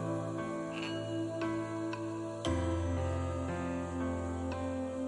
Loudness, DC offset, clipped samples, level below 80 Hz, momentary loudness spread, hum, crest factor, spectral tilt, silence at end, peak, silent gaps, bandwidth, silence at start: -37 LUFS; under 0.1%; under 0.1%; -50 dBFS; 4 LU; none; 16 dB; -6.5 dB/octave; 0 s; -20 dBFS; none; 11.5 kHz; 0 s